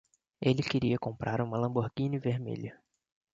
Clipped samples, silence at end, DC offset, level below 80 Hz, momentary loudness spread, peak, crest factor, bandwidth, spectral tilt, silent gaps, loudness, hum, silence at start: under 0.1%; 0.6 s; under 0.1%; -60 dBFS; 8 LU; -12 dBFS; 20 dB; 7.8 kHz; -7.5 dB/octave; none; -32 LUFS; none; 0.4 s